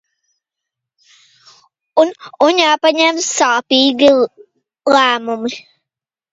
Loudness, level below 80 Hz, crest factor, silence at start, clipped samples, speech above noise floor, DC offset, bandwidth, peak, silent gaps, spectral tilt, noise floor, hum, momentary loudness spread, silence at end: -13 LUFS; -66 dBFS; 16 dB; 1.95 s; under 0.1%; 72 dB; under 0.1%; 8 kHz; 0 dBFS; none; -1.5 dB/octave; -85 dBFS; none; 11 LU; 0.7 s